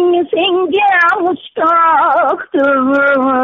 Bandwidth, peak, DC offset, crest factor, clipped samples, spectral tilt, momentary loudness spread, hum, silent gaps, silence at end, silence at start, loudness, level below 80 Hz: 6.8 kHz; -4 dBFS; under 0.1%; 8 dB; under 0.1%; -0.5 dB/octave; 5 LU; none; none; 0 s; 0 s; -12 LUFS; -56 dBFS